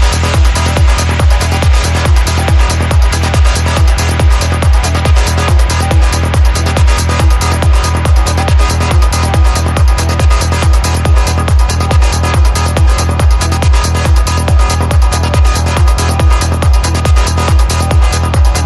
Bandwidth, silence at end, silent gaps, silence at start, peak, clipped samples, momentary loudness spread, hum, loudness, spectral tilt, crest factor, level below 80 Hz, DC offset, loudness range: 13 kHz; 0 s; none; 0 s; 0 dBFS; under 0.1%; 1 LU; none; -10 LUFS; -5 dB/octave; 8 dB; -10 dBFS; under 0.1%; 0 LU